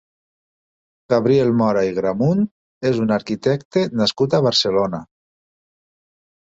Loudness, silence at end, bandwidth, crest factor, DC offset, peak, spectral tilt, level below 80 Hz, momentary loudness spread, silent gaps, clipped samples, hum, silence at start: -19 LUFS; 1.45 s; 8 kHz; 16 dB; under 0.1%; -4 dBFS; -6 dB/octave; -56 dBFS; 6 LU; 2.51-2.81 s, 3.65-3.71 s; under 0.1%; none; 1.1 s